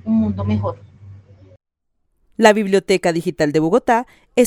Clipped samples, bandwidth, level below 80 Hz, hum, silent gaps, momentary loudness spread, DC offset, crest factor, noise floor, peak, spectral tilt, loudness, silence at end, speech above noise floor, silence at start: under 0.1%; 17.5 kHz; -52 dBFS; none; none; 10 LU; under 0.1%; 18 dB; -69 dBFS; 0 dBFS; -5.5 dB/octave; -17 LUFS; 0 s; 53 dB; 0.05 s